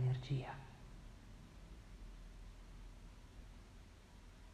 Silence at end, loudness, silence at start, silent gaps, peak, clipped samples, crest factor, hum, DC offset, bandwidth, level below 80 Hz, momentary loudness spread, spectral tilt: 0 s; -51 LUFS; 0 s; none; -30 dBFS; under 0.1%; 18 dB; none; under 0.1%; 10 kHz; -58 dBFS; 17 LU; -7 dB/octave